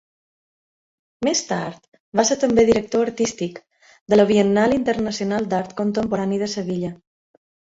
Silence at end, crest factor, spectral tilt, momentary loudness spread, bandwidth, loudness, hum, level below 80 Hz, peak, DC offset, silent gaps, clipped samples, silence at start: 0.8 s; 20 dB; -4.5 dB/octave; 10 LU; 8 kHz; -20 LUFS; none; -52 dBFS; -2 dBFS; under 0.1%; 1.88-1.92 s, 2.00-2.12 s, 4.01-4.06 s; under 0.1%; 1.2 s